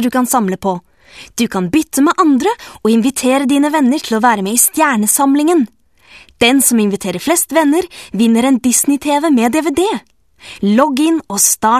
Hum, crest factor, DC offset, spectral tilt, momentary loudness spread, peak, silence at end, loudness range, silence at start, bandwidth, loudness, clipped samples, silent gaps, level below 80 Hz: none; 14 dB; 0.2%; -3.5 dB/octave; 8 LU; 0 dBFS; 0 s; 2 LU; 0 s; 14.5 kHz; -13 LUFS; under 0.1%; none; -50 dBFS